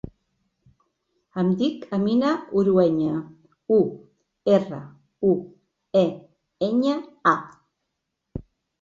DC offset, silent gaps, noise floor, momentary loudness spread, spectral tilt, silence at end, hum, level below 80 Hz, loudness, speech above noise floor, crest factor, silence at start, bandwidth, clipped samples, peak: under 0.1%; none; -80 dBFS; 19 LU; -8 dB/octave; 0.4 s; none; -56 dBFS; -23 LUFS; 58 dB; 20 dB; 1.35 s; 7.4 kHz; under 0.1%; -4 dBFS